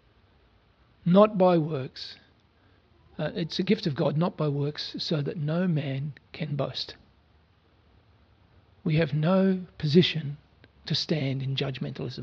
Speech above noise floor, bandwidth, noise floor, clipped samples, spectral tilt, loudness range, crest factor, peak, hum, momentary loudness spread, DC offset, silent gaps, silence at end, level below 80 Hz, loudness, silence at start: 36 dB; 7 kHz; -62 dBFS; under 0.1%; -7.5 dB/octave; 6 LU; 22 dB; -6 dBFS; none; 15 LU; under 0.1%; none; 0 s; -62 dBFS; -27 LUFS; 1.05 s